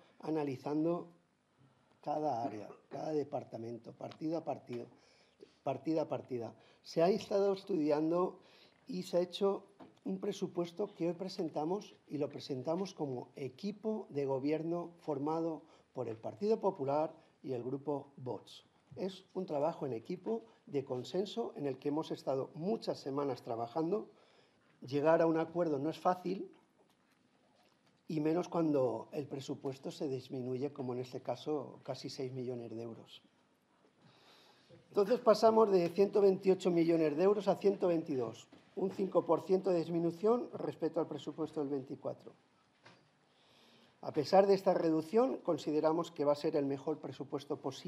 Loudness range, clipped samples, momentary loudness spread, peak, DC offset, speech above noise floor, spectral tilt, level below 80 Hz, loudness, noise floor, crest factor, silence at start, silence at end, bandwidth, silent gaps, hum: 9 LU; under 0.1%; 14 LU; -14 dBFS; under 0.1%; 37 dB; -7 dB/octave; -88 dBFS; -36 LUFS; -72 dBFS; 22 dB; 0.25 s; 0 s; 13 kHz; none; none